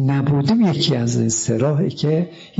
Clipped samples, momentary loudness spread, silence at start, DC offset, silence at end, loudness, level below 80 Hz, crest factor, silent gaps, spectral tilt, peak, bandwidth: under 0.1%; 4 LU; 0 s; under 0.1%; 0 s; -18 LUFS; -54 dBFS; 12 dB; none; -5.5 dB/octave; -6 dBFS; 8 kHz